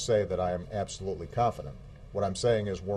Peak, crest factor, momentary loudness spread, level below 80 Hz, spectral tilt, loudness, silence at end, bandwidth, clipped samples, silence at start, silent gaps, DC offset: -14 dBFS; 16 dB; 13 LU; -50 dBFS; -5.5 dB/octave; -31 LUFS; 0 s; 12 kHz; under 0.1%; 0 s; none; under 0.1%